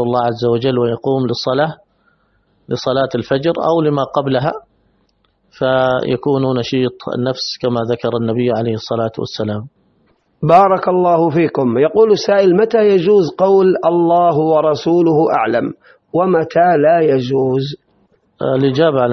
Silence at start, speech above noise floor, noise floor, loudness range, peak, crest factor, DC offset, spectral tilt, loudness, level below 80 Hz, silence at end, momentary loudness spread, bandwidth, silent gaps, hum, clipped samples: 0 s; 46 dB; -60 dBFS; 6 LU; 0 dBFS; 14 dB; under 0.1%; -7 dB/octave; -14 LUFS; -54 dBFS; 0 s; 9 LU; 6.4 kHz; none; none; under 0.1%